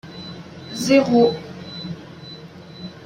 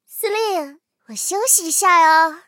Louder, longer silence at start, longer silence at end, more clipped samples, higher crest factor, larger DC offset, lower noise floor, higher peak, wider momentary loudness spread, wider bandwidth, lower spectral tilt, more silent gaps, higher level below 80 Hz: about the same, -18 LUFS vs -16 LUFS; about the same, 0.05 s vs 0.1 s; about the same, 0.05 s vs 0.1 s; neither; about the same, 18 dB vs 16 dB; neither; about the same, -39 dBFS vs -38 dBFS; about the same, -4 dBFS vs -2 dBFS; first, 22 LU vs 14 LU; about the same, 16 kHz vs 17 kHz; first, -5 dB/octave vs 1 dB/octave; neither; first, -60 dBFS vs -88 dBFS